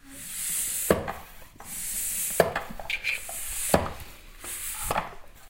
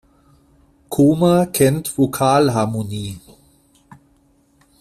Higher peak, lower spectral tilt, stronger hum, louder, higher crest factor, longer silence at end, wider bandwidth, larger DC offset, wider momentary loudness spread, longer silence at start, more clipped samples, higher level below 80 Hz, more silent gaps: about the same, -4 dBFS vs -2 dBFS; second, -2.5 dB/octave vs -6 dB/octave; neither; second, -28 LUFS vs -17 LUFS; first, 28 dB vs 16 dB; second, 0 s vs 1.6 s; about the same, 17 kHz vs 16 kHz; neither; first, 17 LU vs 13 LU; second, 0.05 s vs 0.9 s; neither; about the same, -46 dBFS vs -50 dBFS; neither